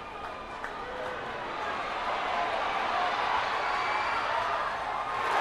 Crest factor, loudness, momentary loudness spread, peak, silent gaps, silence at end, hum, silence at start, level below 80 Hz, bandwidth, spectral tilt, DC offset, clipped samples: 16 dB; -31 LUFS; 9 LU; -14 dBFS; none; 0 s; none; 0 s; -56 dBFS; 14 kHz; -3 dB/octave; under 0.1%; under 0.1%